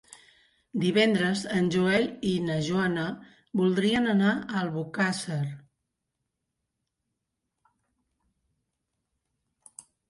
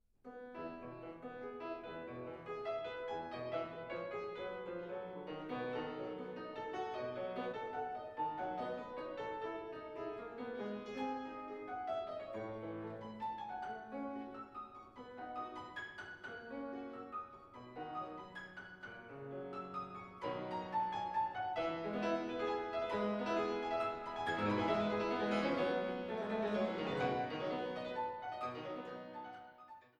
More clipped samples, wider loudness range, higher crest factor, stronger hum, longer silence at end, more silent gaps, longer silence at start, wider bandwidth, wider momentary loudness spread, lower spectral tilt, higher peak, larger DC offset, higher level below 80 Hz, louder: neither; about the same, 9 LU vs 10 LU; about the same, 18 dB vs 20 dB; neither; first, 4.5 s vs 0.1 s; neither; first, 0.75 s vs 0.25 s; first, 11.5 kHz vs 9.8 kHz; second, 10 LU vs 13 LU; about the same, -5.5 dB/octave vs -6.5 dB/octave; first, -10 dBFS vs -22 dBFS; neither; first, -64 dBFS vs -72 dBFS; first, -27 LUFS vs -42 LUFS